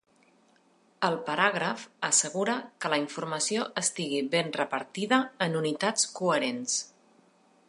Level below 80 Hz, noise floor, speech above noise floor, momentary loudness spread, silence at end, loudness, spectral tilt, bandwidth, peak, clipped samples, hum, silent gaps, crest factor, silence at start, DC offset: -82 dBFS; -64 dBFS; 36 dB; 7 LU; 0.8 s; -28 LUFS; -2.5 dB/octave; 11.5 kHz; -8 dBFS; under 0.1%; none; none; 22 dB; 1 s; under 0.1%